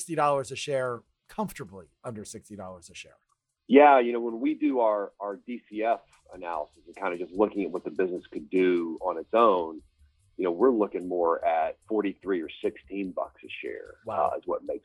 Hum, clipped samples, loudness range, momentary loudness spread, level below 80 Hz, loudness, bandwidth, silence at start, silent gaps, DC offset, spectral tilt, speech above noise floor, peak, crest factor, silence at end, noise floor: none; under 0.1%; 7 LU; 19 LU; -64 dBFS; -27 LUFS; 14.5 kHz; 0 s; none; under 0.1%; -5.5 dB/octave; 34 dB; -4 dBFS; 22 dB; 0.05 s; -61 dBFS